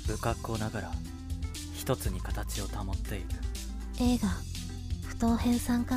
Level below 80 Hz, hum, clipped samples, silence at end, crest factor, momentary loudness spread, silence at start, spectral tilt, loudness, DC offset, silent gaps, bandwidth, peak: -38 dBFS; none; under 0.1%; 0 s; 16 dB; 11 LU; 0 s; -5.5 dB/octave; -33 LUFS; under 0.1%; none; 16 kHz; -16 dBFS